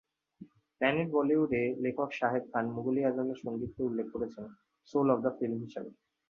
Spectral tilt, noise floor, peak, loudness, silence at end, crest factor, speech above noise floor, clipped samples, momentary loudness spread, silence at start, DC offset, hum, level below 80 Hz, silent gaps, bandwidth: -8 dB/octave; -56 dBFS; -12 dBFS; -32 LUFS; 0.35 s; 20 dB; 24 dB; under 0.1%; 11 LU; 0.4 s; under 0.1%; none; -66 dBFS; none; 6.8 kHz